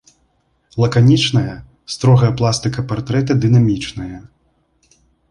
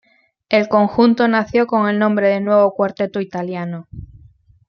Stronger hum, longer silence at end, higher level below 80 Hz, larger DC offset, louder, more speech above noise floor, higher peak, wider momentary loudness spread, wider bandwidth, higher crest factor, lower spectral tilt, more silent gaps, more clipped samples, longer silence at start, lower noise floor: neither; first, 1.1 s vs 0.65 s; first, -44 dBFS vs -50 dBFS; neither; about the same, -15 LUFS vs -16 LUFS; first, 47 dB vs 33 dB; about the same, -2 dBFS vs -2 dBFS; first, 18 LU vs 13 LU; first, 11 kHz vs 6.4 kHz; about the same, 14 dB vs 16 dB; about the same, -6.5 dB/octave vs -7.5 dB/octave; neither; neither; first, 0.75 s vs 0.5 s; first, -62 dBFS vs -49 dBFS